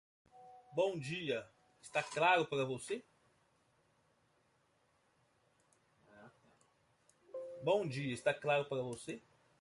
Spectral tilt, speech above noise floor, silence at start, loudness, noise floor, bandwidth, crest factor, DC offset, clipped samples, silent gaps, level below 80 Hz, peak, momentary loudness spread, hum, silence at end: -4.5 dB/octave; 39 dB; 0.35 s; -37 LUFS; -76 dBFS; 11.5 kHz; 22 dB; under 0.1%; under 0.1%; none; -80 dBFS; -18 dBFS; 17 LU; none; 0.4 s